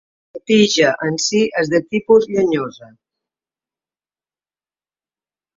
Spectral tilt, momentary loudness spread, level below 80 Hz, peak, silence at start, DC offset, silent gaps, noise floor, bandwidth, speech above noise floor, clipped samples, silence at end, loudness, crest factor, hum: -4 dB/octave; 7 LU; -60 dBFS; -2 dBFS; 0.35 s; under 0.1%; none; under -90 dBFS; 7.8 kHz; over 74 dB; under 0.1%; 2.75 s; -16 LUFS; 18 dB; none